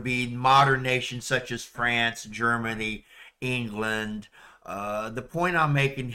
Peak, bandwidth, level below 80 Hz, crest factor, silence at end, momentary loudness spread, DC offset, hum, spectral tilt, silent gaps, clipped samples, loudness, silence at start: -10 dBFS; 16 kHz; -52 dBFS; 18 dB; 0 s; 15 LU; under 0.1%; none; -4.5 dB/octave; none; under 0.1%; -26 LUFS; 0 s